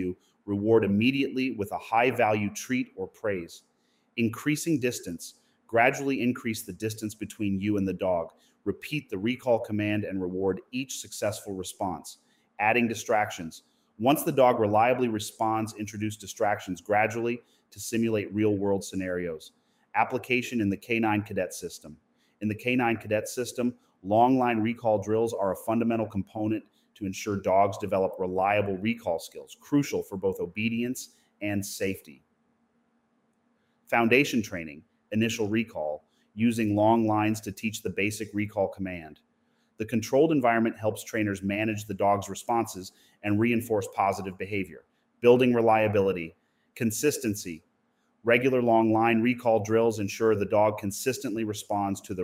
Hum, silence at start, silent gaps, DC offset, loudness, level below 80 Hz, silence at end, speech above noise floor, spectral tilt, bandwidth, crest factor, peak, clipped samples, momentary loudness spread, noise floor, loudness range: none; 0 s; none; under 0.1%; -27 LUFS; -66 dBFS; 0 s; 44 dB; -5.5 dB/octave; 16 kHz; 20 dB; -6 dBFS; under 0.1%; 13 LU; -71 dBFS; 5 LU